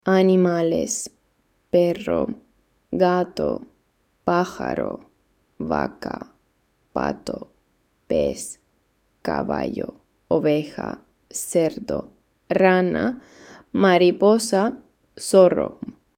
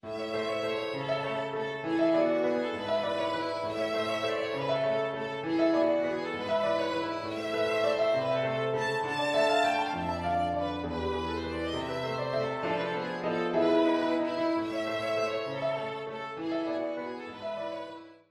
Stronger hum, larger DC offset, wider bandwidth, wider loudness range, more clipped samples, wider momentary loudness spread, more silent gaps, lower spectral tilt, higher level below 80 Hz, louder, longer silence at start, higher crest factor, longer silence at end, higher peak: neither; neither; first, 16.5 kHz vs 13 kHz; first, 9 LU vs 3 LU; neither; first, 17 LU vs 8 LU; neither; about the same, -5.5 dB/octave vs -5.5 dB/octave; first, -52 dBFS vs -58 dBFS; first, -22 LUFS vs -30 LUFS; about the same, 0.05 s vs 0.05 s; about the same, 20 dB vs 16 dB; about the same, 0.25 s vs 0.15 s; first, -2 dBFS vs -14 dBFS